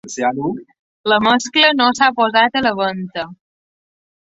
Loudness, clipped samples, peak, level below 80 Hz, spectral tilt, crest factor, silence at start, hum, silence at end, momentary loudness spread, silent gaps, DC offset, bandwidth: -15 LUFS; under 0.1%; 0 dBFS; -58 dBFS; -3 dB/octave; 16 dB; 0.05 s; none; 1 s; 14 LU; 0.79-1.04 s; under 0.1%; 8 kHz